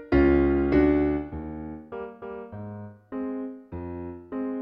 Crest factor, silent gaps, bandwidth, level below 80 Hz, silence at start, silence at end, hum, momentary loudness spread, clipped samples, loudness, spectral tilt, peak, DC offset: 16 dB; none; 5.4 kHz; -38 dBFS; 0 s; 0 s; none; 18 LU; under 0.1%; -25 LUFS; -10.5 dB/octave; -10 dBFS; under 0.1%